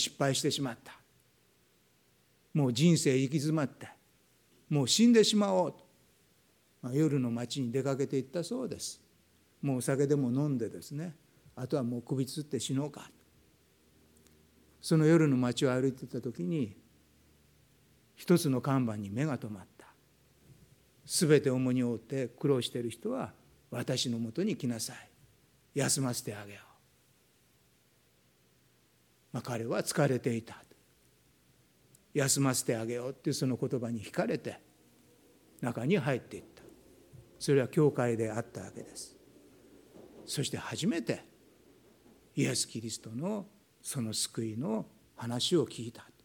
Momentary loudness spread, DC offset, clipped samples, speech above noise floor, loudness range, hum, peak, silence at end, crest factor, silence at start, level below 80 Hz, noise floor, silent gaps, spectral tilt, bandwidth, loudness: 18 LU; under 0.1%; under 0.1%; 37 dB; 8 LU; none; -12 dBFS; 0.2 s; 22 dB; 0 s; -74 dBFS; -69 dBFS; none; -5 dB/octave; 19 kHz; -32 LUFS